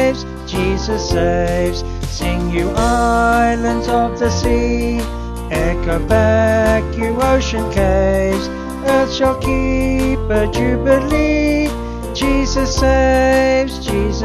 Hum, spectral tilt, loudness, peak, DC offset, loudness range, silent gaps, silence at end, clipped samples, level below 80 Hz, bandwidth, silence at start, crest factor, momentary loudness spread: none; -5.5 dB/octave; -16 LUFS; 0 dBFS; under 0.1%; 1 LU; none; 0 s; under 0.1%; -22 dBFS; 14 kHz; 0 s; 14 dB; 8 LU